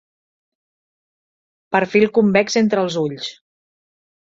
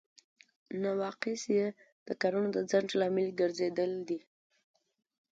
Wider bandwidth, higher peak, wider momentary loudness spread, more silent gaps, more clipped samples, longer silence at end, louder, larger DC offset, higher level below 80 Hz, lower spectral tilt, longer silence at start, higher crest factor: about the same, 7.8 kHz vs 7.8 kHz; first, -2 dBFS vs -16 dBFS; first, 11 LU vs 8 LU; second, none vs 1.92-2.06 s; neither; second, 1 s vs 1.15 s; first, -17 LUFS vs -33 LUFS; neither; first, -62 dBFS vs -78 dBFS; about the same, -5 dB/octave vs -5 dB/octave; first, 1.7 s vs 0.7 s; about the same, 20 dB vs 18 dB